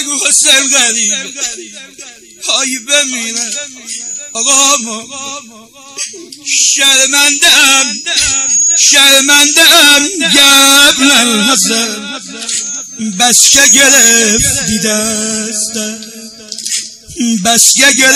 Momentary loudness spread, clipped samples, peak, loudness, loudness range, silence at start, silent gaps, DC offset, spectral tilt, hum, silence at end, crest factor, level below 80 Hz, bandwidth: 18 LU; 0.4%; 0 dBFS; -6 LUFS; 9 LU; 0 s; none; under 0.1%; 0 dB/octave; none; 0 s; 10 dB; -42 dBFS; over 20 kHz